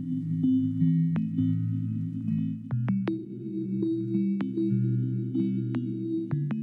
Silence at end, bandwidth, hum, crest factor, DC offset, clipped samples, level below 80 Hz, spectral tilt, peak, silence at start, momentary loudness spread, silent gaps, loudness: 0 s; 4.6 kHz; none; 14 dB; under 0.1%; under 0.1%; -68 dBFS; -11.5 dB/octave; -14 dBFS; 0 s; 6 LU; none; -29 LUFS